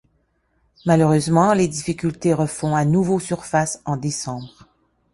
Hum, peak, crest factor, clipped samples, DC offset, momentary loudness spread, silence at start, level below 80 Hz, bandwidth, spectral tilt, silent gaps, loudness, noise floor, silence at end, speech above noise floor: none; -4 dBFS; 18 dB; under 0.1%; under 0.1%; 10 LU; 0.85 s; -52 dBFS; 11.5 kHz; -6 dB/octave; none; -20 LUFS; -65 dBFS; 0.65 s; 46 dB